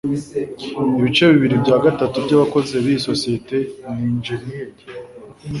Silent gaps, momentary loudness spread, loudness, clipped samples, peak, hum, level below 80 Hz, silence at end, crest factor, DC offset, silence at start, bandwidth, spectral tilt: none; 19 LU; -18 LUFS; under 0.1%; -2 dBFS; none; -50 dBFS; 0 s; 16 dB; under 0.1%; 0.05 s; 11.5 kHz; -6 dB/octave